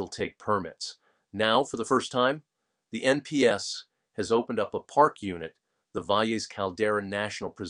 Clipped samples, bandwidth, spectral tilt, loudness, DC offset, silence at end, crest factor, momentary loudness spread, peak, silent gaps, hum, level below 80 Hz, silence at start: under 0.1%; 11 kHz; -4 dB/octave; -28 LUFS; under 0.1%; 0 s; 22 dB; 14 LU; -6 dBFS; none; none; -66 dBFS; 0 s